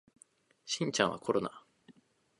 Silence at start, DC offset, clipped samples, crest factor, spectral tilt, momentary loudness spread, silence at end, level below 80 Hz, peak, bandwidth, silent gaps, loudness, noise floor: 0.65 s; under 0.1%; under 0.1%; 28 dB; -3.5 dB/octave; 12 LU; 0.5 s; -72 dBFS; -10 dBFS; 11 kHz; none; -33 LUFS; -66 dBFS